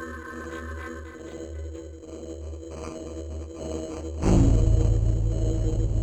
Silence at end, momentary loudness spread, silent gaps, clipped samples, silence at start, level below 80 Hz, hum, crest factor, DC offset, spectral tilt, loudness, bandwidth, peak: 0 s; 18 LU; none; under 0.1%; 0 s; -28 dBFS; none; 18 dB; under 0.1%; -7.5 dB/octave; -28 LUFS; 8.8 kHz; -8 dBFS